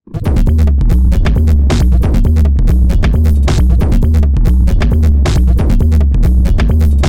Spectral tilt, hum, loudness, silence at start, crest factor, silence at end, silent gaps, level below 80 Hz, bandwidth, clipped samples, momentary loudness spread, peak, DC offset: -7.5 dB/octave; none; -11 LUFS; 0.1 s; 8 dB; 0 s; none; -10 dBFS; 9.8 kHz; under 0.1%; 1 LU; 0 dBFS; 1%